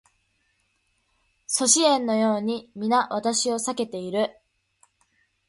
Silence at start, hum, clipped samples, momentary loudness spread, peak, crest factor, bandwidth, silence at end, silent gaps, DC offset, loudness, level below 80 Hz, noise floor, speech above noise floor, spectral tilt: 1.5 s; none; under 0.1%; 12 LU; -4 dBFS; 22 dB; 11.5 kHz; 1.15 s; none; under 0.1%; -23 LUFS; -70 dBFS; -70 dBFS; 47 dB; -2.5 dB/octave